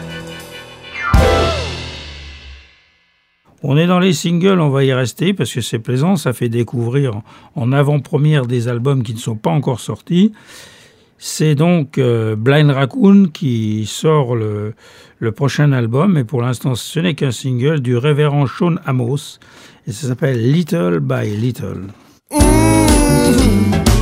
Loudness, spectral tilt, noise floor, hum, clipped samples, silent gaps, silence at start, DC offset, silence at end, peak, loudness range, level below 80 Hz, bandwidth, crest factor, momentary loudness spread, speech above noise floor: -15 LUFS; -6 dB/octave; -58 dBFS; none; under 0.1%; none; 0 s; under 0.1%; 0 s; 0 dBFS; 4 LU; -28 dBFS; 16 kHz; 14 dB; 15 LU; 44 dB